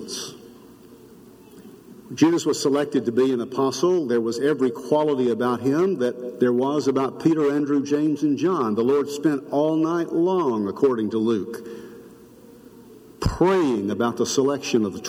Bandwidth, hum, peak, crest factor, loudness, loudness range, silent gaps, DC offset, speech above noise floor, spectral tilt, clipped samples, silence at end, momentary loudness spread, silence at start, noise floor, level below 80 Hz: 16 kHz; none; -4 dBFS; 18 dB; -22 LUFS; 4 LU; none; under 0.1%; 26 dB; -5.5 dB/octave; under 0.1%; 0 s; 6 LU; 0 s; -47 dBFS; -48 dBFS